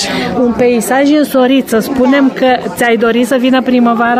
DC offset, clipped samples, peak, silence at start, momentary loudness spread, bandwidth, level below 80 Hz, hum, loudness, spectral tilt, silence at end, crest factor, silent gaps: under 0.1%; under 0.1%; 0 dBFS; 0 s; 3 LU; 16 kHz; -44 dBFS; none; -10 LUFS; -4.5 dB/octave; 0 s; 8 dB; none